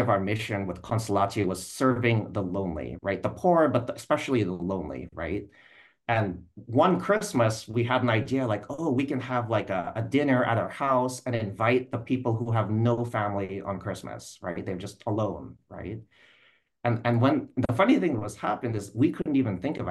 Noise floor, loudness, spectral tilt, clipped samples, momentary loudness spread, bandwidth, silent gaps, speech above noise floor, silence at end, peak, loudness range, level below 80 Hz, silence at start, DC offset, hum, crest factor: -63 dBFS; -27 LUFS; -6.5 dB/octave; under 0.1%; 11 LU; 12.5 kHz; none; 36 dB; 0 s; -8 dBFS; 4 LU; -56 dBFS; 0 s; under 0.1%; none; 18 dB